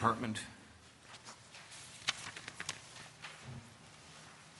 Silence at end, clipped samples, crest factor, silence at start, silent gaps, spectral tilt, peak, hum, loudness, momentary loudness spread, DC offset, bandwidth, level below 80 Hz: 0 s; under 0.1%; 30 dB; 0 s; none; -3.5 dB/octave; -14 dBFS; none; -44 LUFS; 17 LU; under 0.1%; 11.5 kHz; -72 dBFS